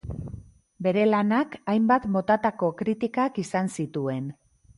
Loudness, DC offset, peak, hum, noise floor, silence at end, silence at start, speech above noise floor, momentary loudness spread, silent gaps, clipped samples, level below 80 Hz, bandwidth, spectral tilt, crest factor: -25 LUFS; under 0.1%; -8 dBFS; none; -44 dBFS; 0.45 s; 0.05 s; 20 dB; 15 LU; none; under 0.1%; -52 dBFS; 11.5 kHz; -7 dB/octave; 16 dB